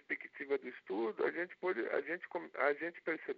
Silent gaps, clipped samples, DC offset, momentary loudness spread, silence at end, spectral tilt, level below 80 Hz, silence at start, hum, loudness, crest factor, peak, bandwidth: none; under 0.1%; under 0.1%; 7 LU; 0 s; -2.5 dB/octave; under -90 dBFS; 0.1 s; none; -39 LUFS; 20 dB; -20 dBFS; 5.2 kHz